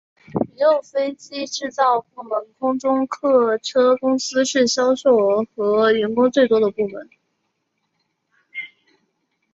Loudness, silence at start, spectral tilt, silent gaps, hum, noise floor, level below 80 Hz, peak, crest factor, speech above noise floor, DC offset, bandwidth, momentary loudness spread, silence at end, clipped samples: -19 LUFS; 0.35 s; -4 dB/octave; none; none; -72 dBFS; -64 dBFS; -4 dBFS; 16 dB; 54 dB; under 0.1%; 7.8 kHz; 12 LU; 0.9 s; under 0.1%